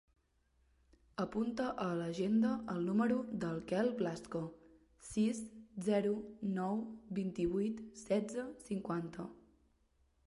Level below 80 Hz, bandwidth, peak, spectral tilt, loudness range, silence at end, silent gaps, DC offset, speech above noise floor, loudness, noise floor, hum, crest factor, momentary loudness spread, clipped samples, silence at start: -66 dBFS; 11.5 kHz; -22 dBFS; -6.5 dB/octave; 3 LU; 0.9 s; none; under 0.1%; 38 dB; -38 LUFS; -75 dBFS; none; 16 dB; 11 LU; under 0.1%; 1.2 s